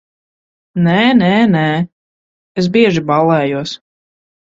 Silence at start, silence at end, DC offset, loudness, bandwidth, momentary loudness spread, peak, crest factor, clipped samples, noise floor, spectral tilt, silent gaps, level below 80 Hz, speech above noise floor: 0.75 s; 0.75 s; under 0.1%; -13 LUFS; 7.6 kHz; 15 LU; 0 dBFS; 14 dB; under 0.1%; under -90 dBFS; -7 dB/octave; 1.92-2.55 s; -52 dBFS; over 78 dB